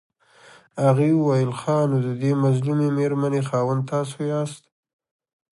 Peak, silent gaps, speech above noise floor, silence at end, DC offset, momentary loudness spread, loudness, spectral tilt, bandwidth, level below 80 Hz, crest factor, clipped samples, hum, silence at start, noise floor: -8 dBFS; none; 30 dB; 0.95 s; under 0.1%; 7 LU; -22 LUFS; -8 dB/octave; 11.5 kHz; -68 dBFS; 16 dB; under 0.1%; none; 0.75 s; -51 dBFS